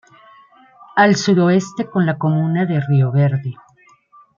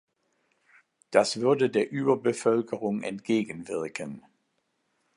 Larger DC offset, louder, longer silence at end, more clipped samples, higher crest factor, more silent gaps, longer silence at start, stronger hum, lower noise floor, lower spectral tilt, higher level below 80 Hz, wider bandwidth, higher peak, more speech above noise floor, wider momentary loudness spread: neither; first, -16 LUFS vs -27 LUFS; second, 0.85 s vs 1 s; neither; second, 16 dB vs 24 dB; neither; second, 0.95 s vs 1.1 s; neither; second, -52 dBFS vs -75 dBFS; first, -6.5 dB/octave vs -5 dB/octave; first, -62 dBFS vs -74 dBFS; second, 7.4 kHz vs 11.5 kHz; about the same, -2 dBFS vs -4 dBFS; second, 36 dB vs 49 dB; second, 8 LU vs 11 LU